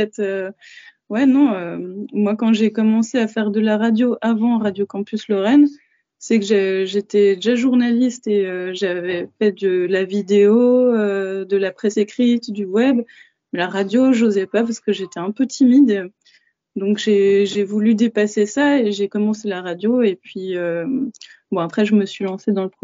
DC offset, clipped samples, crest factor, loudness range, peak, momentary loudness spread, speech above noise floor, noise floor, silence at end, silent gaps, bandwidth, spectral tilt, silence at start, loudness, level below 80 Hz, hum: under 0.1%; under 0.1%; 14 dB; 2 LU; -4 dBFS; 10 LU; 40 dB; -57 dBFS; 0.15 s; none; 7.6 kHz; -5.5 dB/octave; 0 s; -18 LUFS; -70 dBFS; none